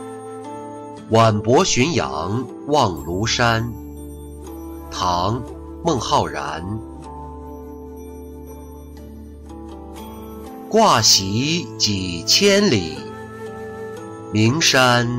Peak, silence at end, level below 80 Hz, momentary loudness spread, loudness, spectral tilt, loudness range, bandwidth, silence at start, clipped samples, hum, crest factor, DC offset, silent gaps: -4 dBFS; 0 s; -42 dBFS; 22 LU; -17 LUFS; -3.5 dB/octave; 17 LU; 16 kHz; 0 s; under 0.1%; none; 16 dB; under 0.1%; none